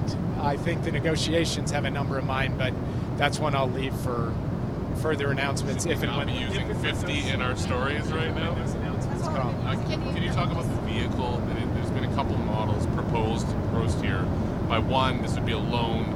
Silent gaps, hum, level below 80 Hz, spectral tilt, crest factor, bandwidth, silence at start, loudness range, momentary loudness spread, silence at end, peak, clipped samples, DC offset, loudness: none; none; -38 dBFS; -6 dB/octave; 18 dB; 15 kHz; 0 s; 1 LU; 4 LU; 0 s; -8 dBFS; under 0.1%; under 0.1%; -27 LUFS